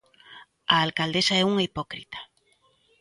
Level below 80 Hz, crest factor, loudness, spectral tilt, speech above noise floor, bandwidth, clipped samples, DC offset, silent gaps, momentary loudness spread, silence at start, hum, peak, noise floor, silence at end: -60 dBFS; 24 dB; -23 LUFS; -4 dB/octave; 40 dB; 11.5 kHz; under 0.1%; under 0.1%; none; 17 LU; 0.3 s; none; -4 dBFS; -65 dBFS; 0.75 s